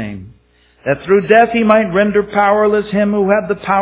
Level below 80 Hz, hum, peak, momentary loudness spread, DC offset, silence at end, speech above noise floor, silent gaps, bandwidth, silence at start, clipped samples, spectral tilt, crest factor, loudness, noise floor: -46 dBFS; none; 0 dBFS; 10 LU; under 0.1%; 0 s; 39 dB; none; 4 kHz; 0 s; under 0.1%; -10 dB/octave; 14 dB; -13 LUFS; -51 dBFS